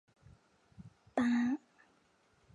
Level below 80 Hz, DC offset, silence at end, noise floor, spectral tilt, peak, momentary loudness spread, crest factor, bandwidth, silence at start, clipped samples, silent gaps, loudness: -72 dBFS; under 0.1%; 0.95 s; -71 dBFS; -6 dB/octave; -20 dBFS; 26 LU; 20 dB; 7.8 kHz; 0.8 s; under 0.1%; none; -35 LUFS